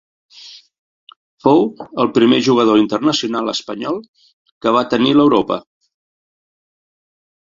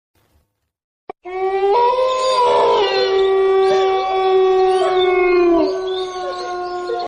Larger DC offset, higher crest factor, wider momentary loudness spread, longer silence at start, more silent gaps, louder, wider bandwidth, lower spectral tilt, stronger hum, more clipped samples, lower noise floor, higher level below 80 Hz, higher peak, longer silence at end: neither; first, 16 dB vs 10 dB; about the same, 12 LU vs 10 LU; second, 0.45 s vs 1.25 s; first, 0.78-1.07 s, 1.16-1.37 s, 4.08-4.14 s, 4.33-4.45 s, 4.52-4.61 s vs none; about the same, -15 LUFS vs -16 LUFS; second, 7.6 kHz vs 9.8 kHz; first, -5.5 dB/octave vs -4 dB/octave; neither; neither; second, -41 dBFS vs -63 dBFS; second, -56 dBFS vs -50 dBFS; first, 0 dBFS vs -6 dBFS; first, 2 s vs 0 s